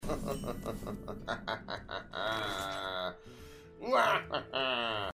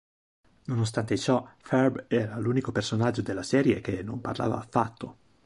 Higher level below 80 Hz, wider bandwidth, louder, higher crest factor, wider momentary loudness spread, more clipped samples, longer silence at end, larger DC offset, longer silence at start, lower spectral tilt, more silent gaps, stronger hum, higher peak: about the same, -52 dBFS vs -56 dBFS; first, 15.5 kHz vs 11.5 kHz; second, -35 LUFS vs -28 LUFS; about the same, 22 dB vs 20 dB; first, 14 LU vs 8 LU; neither; second, 0 s vs 0.35 s; neither; second, 0 s vs 0.7 s; second, -4 dB/octave vs -6.5 dB/octave; neither; neither; second, -14 dBFS vs -8 dBFS